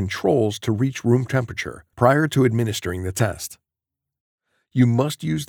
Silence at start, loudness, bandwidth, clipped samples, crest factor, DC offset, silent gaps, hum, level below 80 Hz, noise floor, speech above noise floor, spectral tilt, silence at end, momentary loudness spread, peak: 0 s; -21 LUFS; 19 kHz; under 0.1%; 20 dB; under 0.1%; 4.20-4.38 s; none; -56 dBFS; -85 dBFS; 65 dB; -6 dB/octave; 0.05 s; 11 LU; 0 dBFS